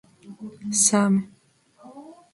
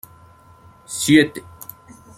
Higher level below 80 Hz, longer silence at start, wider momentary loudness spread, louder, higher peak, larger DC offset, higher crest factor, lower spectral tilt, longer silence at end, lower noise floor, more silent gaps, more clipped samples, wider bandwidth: second, -70 dBFS vs -58 dBFS; second, 0.25 s vs 0.9 s; about the same, 23 LU vs 23 LU; second, -20 LUFS vs -17 LUFS; second, -6 dBFS vs -2 dBFS; neither; about the same, 20 dB vs 20 dB; about the same, -3.5 dB/octave vs -4 dB/octave; second, 0.2 s vs 0.8 s; first, -57 dBFS vs -48 dBFS; neither; neither; second, 11.5 kHz vs 16 kHz